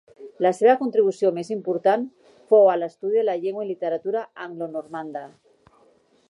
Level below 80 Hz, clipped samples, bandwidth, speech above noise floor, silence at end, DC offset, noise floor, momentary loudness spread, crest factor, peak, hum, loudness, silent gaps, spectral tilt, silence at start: -78 dBFS; under 0.1%; 11 kHz; 38 dB; 1 s; under 0.1%; -59 dBFS; 16 LU; 18 dB; -6 dBFS; none; -22 LUFS; none; -6.5 dB/octave; 0.2 s